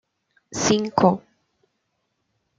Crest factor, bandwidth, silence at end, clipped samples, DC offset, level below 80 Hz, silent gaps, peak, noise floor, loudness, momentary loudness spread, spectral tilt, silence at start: 22 dB; 9.4 kHz; 1.4 s; under 0.1%; under 0.1%; -58 dBFS; none; -2 dBFS; -74 dBFS; -21 LUFS; 13 LU; -4.5 dB/octave; 0.5 s